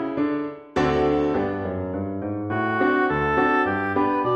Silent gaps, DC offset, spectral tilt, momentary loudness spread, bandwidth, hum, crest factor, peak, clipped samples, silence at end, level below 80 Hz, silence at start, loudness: none; under 0.1%; -7.5 dB/octave; 8 LU; 8 kHz; none; 14 dB; -8 dBFS; under 0.1%; 0 s; -46 dBFS; 0 s; -23 LUFS